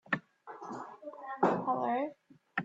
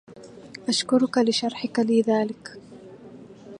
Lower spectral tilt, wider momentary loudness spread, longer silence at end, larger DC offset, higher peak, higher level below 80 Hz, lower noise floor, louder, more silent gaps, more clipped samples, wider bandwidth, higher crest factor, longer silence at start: first, -7 dB/octave vs -4 dB/octave; second, 16 LU vs 24 LU; about the same, 0 s vs 0 s; neither; second, -14 dBFS vs -8 dBFS; second, -78 dBFS vs -70 dBFS; first, -54 dBFS vs -45 dBFS; second, -35 LUFS vs -23 LUFS; neither; neither; second, 7.8 kHz vs 11 kHz; about the same, 22 dB vs 18 dB; about the same, 0.1 s vs 0.1 s